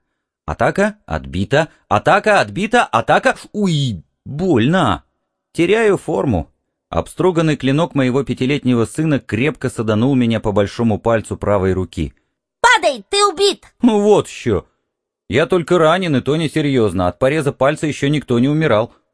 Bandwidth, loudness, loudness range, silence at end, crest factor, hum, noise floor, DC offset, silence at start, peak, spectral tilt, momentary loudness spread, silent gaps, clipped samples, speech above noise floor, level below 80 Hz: 11 kHz; -16 LUFS; 2 LU; 0.25 s; 16 dB; none; -76 dBFS; 0.2%; 0.5 s; 0 dBFS; -5.5 dB/octave; 9 LU; none; under 0.1%; 60 dB; -42 dBFS